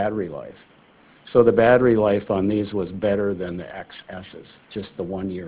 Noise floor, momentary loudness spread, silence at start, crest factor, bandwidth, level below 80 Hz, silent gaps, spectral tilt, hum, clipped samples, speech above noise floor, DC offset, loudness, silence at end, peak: -53 dBFS; 21 LU; 0 s; 20 dB; 4 kHz; -50 dBFS; none; -11 dB/octave; none; under 0.1%; 31 dB; under 0.1%; -21 LUFS; 0 s; -2 dBFS